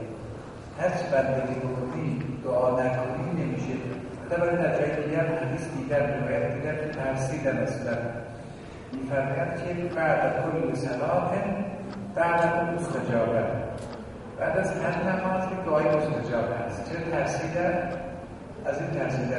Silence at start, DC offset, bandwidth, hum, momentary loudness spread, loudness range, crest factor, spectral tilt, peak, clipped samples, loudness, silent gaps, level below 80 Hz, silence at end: 0 s; under 0.1%; 11.5 kHz; none; 12 LU; 2 LU; 18 dB; -7 dB/octave; -8 dBFS; under 0.1%; -28 LUFS; none; -52 dBFS; 0 s